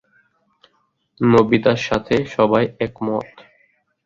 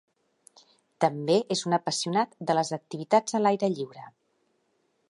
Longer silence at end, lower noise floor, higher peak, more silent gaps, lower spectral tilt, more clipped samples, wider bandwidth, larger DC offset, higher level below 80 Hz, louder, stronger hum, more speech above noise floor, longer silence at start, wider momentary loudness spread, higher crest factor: second, 0.8 s vs 1 s; second, -66 dBFS vs -72 dBFS; first, -2 dBFS vs -8 dBFS; neither; first, -7 dB/octave vs -4.5 dB/octave; neither; second, 7.6 kHz vs 11.5 kHz; neither; first, -50 dBFS vs -80 dBFS; first, -18 LUFS vs -27 LUFS; neither; about the same, 48 dB vs 46 dB; first, 1.2 s vs 1 s; about the same, 10 LU vs 8 LU; about the same, 18 dB vs 20 dB